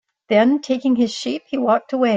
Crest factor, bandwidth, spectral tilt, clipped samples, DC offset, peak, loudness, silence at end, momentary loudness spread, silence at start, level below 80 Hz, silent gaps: 16 dB; 7.8 kHz; -5 dB/octave; under 0.1%; under 0.1%; -4 dBFS; -19 LUFS; 0 s; 7 LU; 0.3 s; -64 dBFS; none